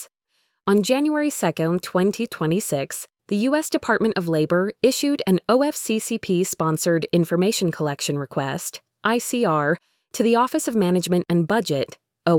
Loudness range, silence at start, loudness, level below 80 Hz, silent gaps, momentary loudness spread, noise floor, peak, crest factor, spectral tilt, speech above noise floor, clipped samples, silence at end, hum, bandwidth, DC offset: 2 LU; 0 s; -22 LUFS; -62 dBFS; none; 7 LU; -70 dBFS; -6 dBFS; 16 dB; -5 dB/octave; 50 dB; under 0.1%; 0 s; none; 19 kHz; under 0.1%